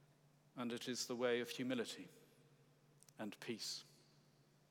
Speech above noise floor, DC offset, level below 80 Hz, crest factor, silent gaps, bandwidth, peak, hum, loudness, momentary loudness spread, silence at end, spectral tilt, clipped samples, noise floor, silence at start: 28 dB; under 0.1%; under -90 dBFS; 20 dB; none; 18.5 kHz; -28 dBFS; none; -45 LUFS; 19 LU; 0.75 s; -3.5 dB/octave; under 0.1%; -72 dBFS; 0.55 s